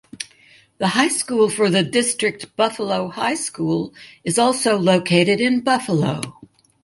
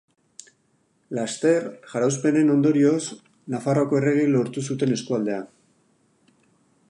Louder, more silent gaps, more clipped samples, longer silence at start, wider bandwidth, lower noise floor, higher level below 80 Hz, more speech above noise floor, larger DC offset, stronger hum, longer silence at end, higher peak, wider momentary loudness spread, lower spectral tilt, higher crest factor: first, -19 LUFS vs -22 LUFS; neither; neither; second, 0.15 s vs 1.1 s; about the same, 11.5 kHz vs 11 kHz; second, -52 dBFS vs -66 dBFS; first, -60 dBFS vs -72 dBFS; second, 33 dB vs 45 dB; neither; neither; second, 0.4 s vs 1.45 s; first, -2 dBFS vs -8 dBFS; about the same, 13 LU vs 14 LU; second, -4 dB/octave vs -6 dB/octave; about the same, 18 dB vs 16 dB